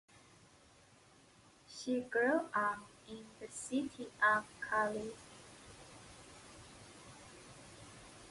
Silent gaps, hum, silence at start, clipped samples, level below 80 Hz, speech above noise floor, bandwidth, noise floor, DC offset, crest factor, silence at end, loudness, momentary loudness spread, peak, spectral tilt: none; none; 1.7 s; under 0.1%; -72 dBFS; 27 dB; 11.5 kHz; -64 dBFS; under 0.1%; 22 dB; 0 s; -37 LUFS; 22 LU; -20 dBFS; -3.5 dB/octave